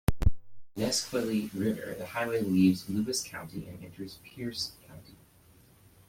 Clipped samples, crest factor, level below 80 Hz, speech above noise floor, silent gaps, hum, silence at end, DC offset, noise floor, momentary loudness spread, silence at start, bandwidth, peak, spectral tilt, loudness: under 0.1%; 20 dB; -42 dBFS; 28 dB; none; none; 1 s; under 0.1%; -59 dBFS; 19 LU; 0.1 s; 16.5 kHz; -10 dBFS; -5 dB/octave; -31 LUFS